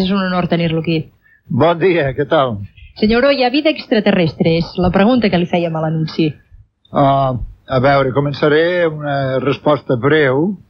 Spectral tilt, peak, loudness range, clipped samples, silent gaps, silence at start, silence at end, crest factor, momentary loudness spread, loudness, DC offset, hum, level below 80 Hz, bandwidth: -8.5 dB/octave; -2 dBFS; 2 LU; under 0.1%; none; 0 s; 0.15 s; 12 dB; 7 LU; -15 LUFS; under 0.1%; none; -38 dBFS; 6.2 kHz